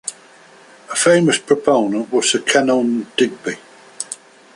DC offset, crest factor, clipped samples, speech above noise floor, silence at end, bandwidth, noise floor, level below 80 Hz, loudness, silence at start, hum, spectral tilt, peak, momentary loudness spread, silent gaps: under 0.1%; 16 dB; under 0.1%; 29 dB; 0.4 s; 11.5 kHz; -45 dBFS; -64 dBFS; -16 LUFS; 0.05 s; none; -3.5 dB/octave; -2 dBFS; 15 LU; none